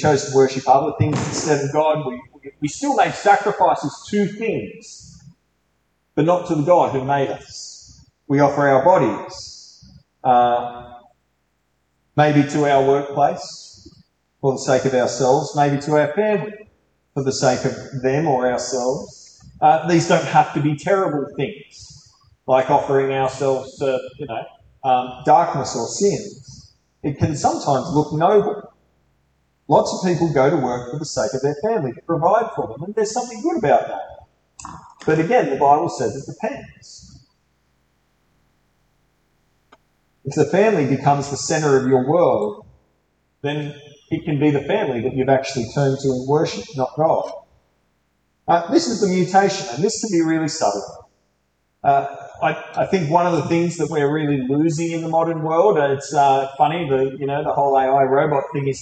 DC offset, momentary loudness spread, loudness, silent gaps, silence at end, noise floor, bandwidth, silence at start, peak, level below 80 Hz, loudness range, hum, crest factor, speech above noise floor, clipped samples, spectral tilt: under 0.1%; 13 LU; -19 LUFS; none; 0 s; -68 dBFS; 9.2 kHz; 0 s; -2 dBFS; -56 dBFS; 3 LU; none; 18 dB; 50 dB; under 0.1%; -5.5 dB/octave